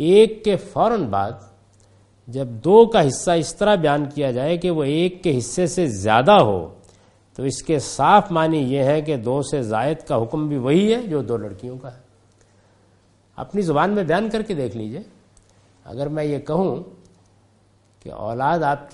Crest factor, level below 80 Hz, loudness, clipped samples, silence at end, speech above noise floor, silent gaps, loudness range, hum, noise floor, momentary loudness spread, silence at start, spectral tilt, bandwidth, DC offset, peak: 20 dB; -50 dBFS; -19 LUFS; under 0.1%; 0.05 s; 38 dB; none; 8 LU; none; -57 dBFS; 17 LU; 0 s; -6 dB/octave; 11.5 kHz; under 0.1%; 0 dBFS